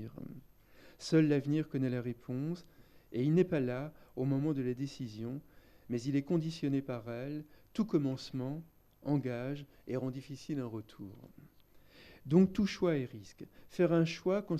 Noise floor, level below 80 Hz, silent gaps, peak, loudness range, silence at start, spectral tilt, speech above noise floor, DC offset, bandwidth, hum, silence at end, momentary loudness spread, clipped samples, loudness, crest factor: -61 dBFS; -66 dBFS; none; -16 dBFS; 6 LU; 0 s; -7.5 dB/octave; 27 dB; under 0.1%; 13.5 kHz; none; 0 s; 16 LU; under 0.1%; -35 LUFS; 18 dB